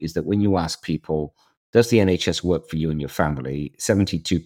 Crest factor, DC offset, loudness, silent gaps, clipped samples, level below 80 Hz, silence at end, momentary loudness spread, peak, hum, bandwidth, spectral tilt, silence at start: 20 dB; under 0.1%; -22 LUFS; 1.57-1.73 s; under 0.1%; -46 dBFS; 0 s; 9 LU; -2 dBFS; none; 17 kHz; -5.5 dB/octave; 0 s